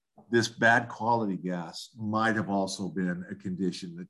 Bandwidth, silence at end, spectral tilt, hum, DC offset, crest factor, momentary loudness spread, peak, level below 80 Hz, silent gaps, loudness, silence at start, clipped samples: 12.5 kHz; 0.05 s; -5 dB/octave; none; under 0.1%; 20 dB; 13 LU; -10 dBFS; -66 dBFS; none; -29 LUFS; 0.3 s; under 0.1%